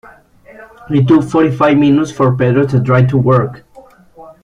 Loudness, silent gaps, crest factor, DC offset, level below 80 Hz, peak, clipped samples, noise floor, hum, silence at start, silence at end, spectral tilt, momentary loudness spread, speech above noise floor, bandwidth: -12 LUFS; none; 12 dB; under 0.1%; -46 dBFS; 0 dBFS; under 0.1%; -41 dBFS; none; 0.6 s; 0.15 s; -8.5 dB/octave; 4 LU; 31 dB; 9.6 kHz